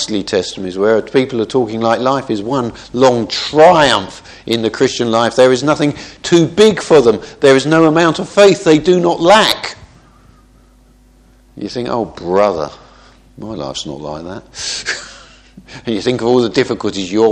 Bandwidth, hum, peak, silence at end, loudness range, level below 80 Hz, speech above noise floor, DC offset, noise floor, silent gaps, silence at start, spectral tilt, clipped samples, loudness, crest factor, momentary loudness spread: 13 kHz; none; 0 dBFS; 0 s; 10 LU; -46 dBFS; 34 dB; under 0.1%; -47 dBFS; none; 0 s; -4.5 dB/octave; 0.2%; -13 LUFS; 14 dB; 16 LU